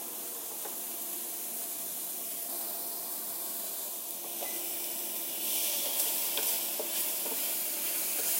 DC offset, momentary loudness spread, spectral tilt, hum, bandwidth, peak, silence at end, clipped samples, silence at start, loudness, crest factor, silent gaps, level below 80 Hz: under 0.1%; 7 LU; 1 dB/octave; none; 16 kHz; -16 dBFS; 0 s; under 0.1%; 0 s; -32 LUFS; 20 dB; none; under -90 dBFS